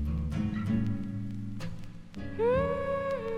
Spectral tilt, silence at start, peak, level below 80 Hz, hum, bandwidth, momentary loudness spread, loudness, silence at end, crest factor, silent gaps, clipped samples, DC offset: -8.5 dB/octave; 0 s; -18 dBFS; -42 dBFS; none; 11.5 kHz; 14 LU; -32 LUFS; 0 s; 14 dB; none; under 0.1%; under 0.1%